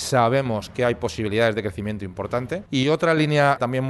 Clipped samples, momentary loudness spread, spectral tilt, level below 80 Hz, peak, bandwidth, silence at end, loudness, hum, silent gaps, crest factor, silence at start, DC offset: under 0.1%; 9 LU; -5.5 dB/octave; -50 dBFS; -6 dBFS; 12 kHz; 0 s; -22 LUFS; none; none; 16 dB; 0 s; under 0.1%